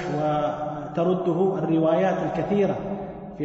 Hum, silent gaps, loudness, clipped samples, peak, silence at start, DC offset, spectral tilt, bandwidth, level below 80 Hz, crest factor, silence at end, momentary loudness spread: none; none; -24 LUFS; under 0.1%; -10 dBFS; 0 s; under 0.1%; -8.5 dB/octave; 7.8 kHz; -54 dBFS; 12 dB; 0 s; 9 LU